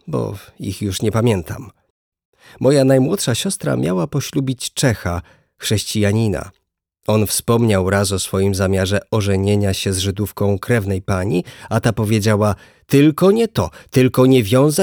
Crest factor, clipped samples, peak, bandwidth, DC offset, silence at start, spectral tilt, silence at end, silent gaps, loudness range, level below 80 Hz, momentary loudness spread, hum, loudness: 16 dB; under 0.1%; -2 dBFS; over 20 kHz; under 0.1%; 0.05 s; -5.5 dB/octave; 0 s; 1.90-2.12 s, 2.25-2.33 s; 3 LU; -44 dBFS; 10 LU; none; -17 LUFS